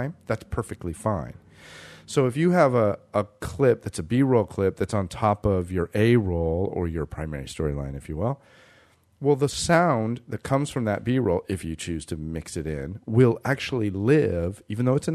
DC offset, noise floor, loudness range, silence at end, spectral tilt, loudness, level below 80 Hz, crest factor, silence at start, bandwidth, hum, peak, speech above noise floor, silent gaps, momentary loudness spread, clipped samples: under 0.1%; -58 dBFS; 4 LU; 0 s; -6.5 dB/octave; -25 LUFS; -44 dBFS; 18 dB; 0 s; 13.5 kHz; none; -6 dBFS; 34 dB; none; 12 LU; under 0.1%